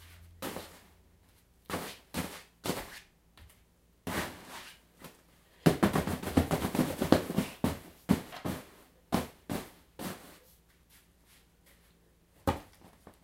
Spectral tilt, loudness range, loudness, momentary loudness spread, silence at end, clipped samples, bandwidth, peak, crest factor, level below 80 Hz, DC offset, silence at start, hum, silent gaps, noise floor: -5.5 dB/octave; 12 LU; -34 LUFS; 23 LU; 0.15 s; under 0.1%; 16 kHz; -6 dBFS; 30 dB; -54 dBFS; under 0.1%; 0 s; none; none; -65 dBFS